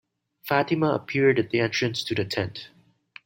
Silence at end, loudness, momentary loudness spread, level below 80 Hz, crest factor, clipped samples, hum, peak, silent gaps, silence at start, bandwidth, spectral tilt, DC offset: 0.6 s; -24 LUFS; 10 LU; -62 dBFS; 20 dB; under 0.1%; none; -6 dBFS; none; 0.45 s; 16.5 kHz; -5.5 dB/octave; under 0.1%